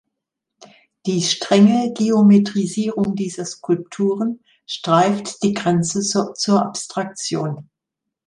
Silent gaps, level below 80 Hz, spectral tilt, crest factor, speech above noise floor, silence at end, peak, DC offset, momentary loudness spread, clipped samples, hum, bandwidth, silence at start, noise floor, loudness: none; -62 dBFS; -5 dB/octave; 18 dB; 64 dB; 0.65 s; -2 dBFS; under 0.1%; 13 LU; under 0.1%; none; 11 kHz; 1.05 s; -82 dBFS; -19 LUFS